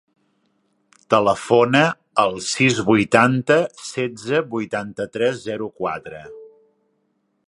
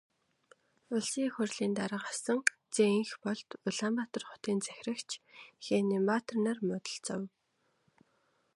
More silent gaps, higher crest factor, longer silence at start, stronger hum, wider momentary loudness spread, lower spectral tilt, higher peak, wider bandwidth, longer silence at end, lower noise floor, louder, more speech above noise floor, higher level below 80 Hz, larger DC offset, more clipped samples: neither; second, 20 dB vs 28 dB; first, 1.1 s vs 0.9 s; neither; about the same, 12 LU vs 10 LU; about the same, -5 dB/octave vs -4 dB/octave; first, 0 dBFS vs -8 dBFS; about the same, 11.5 kHz vs 11.5 kHz; second, 1 s vs 1.3 s; second, -69 dBFS vs -77 dBFS; first, -19 LUFS vs -34 LUFS; first, 50 dB vs 43 dB; first, -58 dBFS vs -82 dBFS; neither; neither